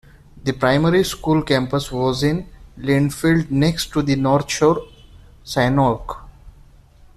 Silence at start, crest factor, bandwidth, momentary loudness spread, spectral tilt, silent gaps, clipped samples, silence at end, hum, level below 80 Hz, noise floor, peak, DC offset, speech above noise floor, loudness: 0.35 s; 16 dB; 14 kHz; 10 LU; -6 dB/octave; none; under 0.1%; 0.65 s; none; -40 dBFS; -47 dBFS; -2 dBFS; under 0.1%; 29 dB; -19 LUFS